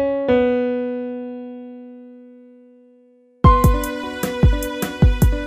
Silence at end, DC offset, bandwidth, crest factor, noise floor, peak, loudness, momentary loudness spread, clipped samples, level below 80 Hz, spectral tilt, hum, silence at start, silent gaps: 0 s; under 0.1%; 16 kHz; 18 dB; -53 dBFS; 0 dBFS; -19 LUFS; 20 LU; under 0.1%; -24 dBFS; -7 dB/octave; none; 0 s; none